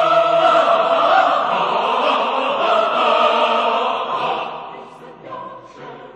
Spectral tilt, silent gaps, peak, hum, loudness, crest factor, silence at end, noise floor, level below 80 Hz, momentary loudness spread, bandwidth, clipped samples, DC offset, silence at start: -3.5 dB/octave; none; -2 dBFS; none; -16 LUFS; 14 dB; 0.05 s; -37 dBFS; -64 dBFS; 20 LU; 8.8 kHz; under 0.1%; under 0.1%; 0 s